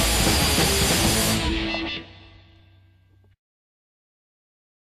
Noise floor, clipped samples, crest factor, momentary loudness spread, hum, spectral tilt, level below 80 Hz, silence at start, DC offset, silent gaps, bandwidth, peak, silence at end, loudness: -57 dBFS; under 0.1%; 14 dB; 9 LU; none; -3 dB/octave; -34 dBFS; 0 s; under 0.1%; none; 15.5 kHz; -10 dBFS; 2.8 s; -20 LUFS